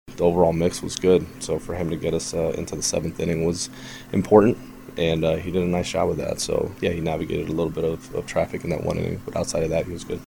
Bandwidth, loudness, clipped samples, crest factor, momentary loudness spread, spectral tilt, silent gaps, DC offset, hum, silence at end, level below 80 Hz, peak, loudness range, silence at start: 19 kHz; -24 LUFS; under 0.1%; 22 dB; 9 LU; -5.5 dB/octave; none; under 0.1%; none; 0.05 s; -44 dBFS; 0 dBFS; 4 LU; 0.05 s